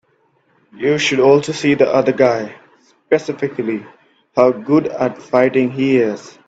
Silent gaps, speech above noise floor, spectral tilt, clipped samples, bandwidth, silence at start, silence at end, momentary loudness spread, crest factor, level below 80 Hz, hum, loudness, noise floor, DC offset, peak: none; 44 dB; -5.5 dB/octave; under 0.1%; 8 kHz; 0.75 s; 0.2 s; 10 LU; 16 dB; -60 dBFS; none; -16 LUFS; -59 dBFS; under 0.1%; 0 dBFS